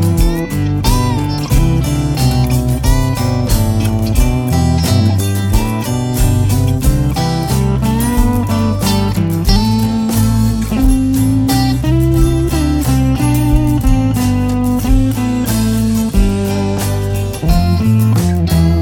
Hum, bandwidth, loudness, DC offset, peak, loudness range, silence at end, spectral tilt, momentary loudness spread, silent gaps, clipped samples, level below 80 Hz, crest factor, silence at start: none; 18 kHz; -14 LUFS; under 0.1%; 0 dBFS; 1 LU; 0 s; -6.5 dB/octave; 3 LU; none; under 0.1%; -18 dBFS; 12 dB; 0 s